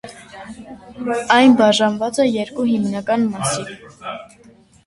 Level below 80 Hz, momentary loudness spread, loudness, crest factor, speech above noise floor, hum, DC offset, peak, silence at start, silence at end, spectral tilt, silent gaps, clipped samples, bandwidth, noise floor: -56 dBFS; 24 LU; -16 LUFS; 18 dB; 31 dB; none; under 0.1%; 0 dBFS; 0.05 s; 0.6 s; -4 dB/octave; none; under 0.1%; 11.5 kHz; -49 dBFS